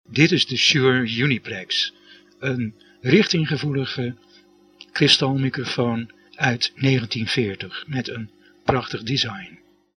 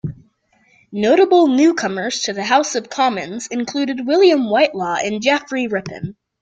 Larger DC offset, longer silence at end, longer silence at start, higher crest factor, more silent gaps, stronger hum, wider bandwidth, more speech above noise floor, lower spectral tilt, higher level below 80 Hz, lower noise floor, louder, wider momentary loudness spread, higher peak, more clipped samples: neither; first, 0.45 s vs 0.3 s; about the same, 0.1 s vs 0.05 s; first, 22 dB vs 16 dB; neither; first, 50 Hz at -45 dBFS vs none; first, 10.5 kHz vs 9 kHz; second, 32 dB vs 41 dB; about the same, -4.5 dB/octave vs -4 dB/octave; about the same, -56 dBFS vs -58 dBFS; second, -53 dBFS vs -58 dBFS; second, -21 LUFS vs -17 LUFS; about the same, 14 LU vs 13 LU; about the same, 0 dBFS vs -2 dBFS; neither